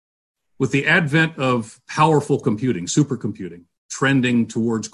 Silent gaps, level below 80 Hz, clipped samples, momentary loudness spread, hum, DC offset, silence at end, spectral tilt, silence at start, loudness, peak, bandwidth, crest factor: 3.78-3.89 s; -56 dBFS; under 0.1%; 12 LU; none; under 0.1%; 0.05 s; -5.5 dB/octave; 0.6 s; -19 LUFS; -4 dBFS; 11.5 kHz; 16 dB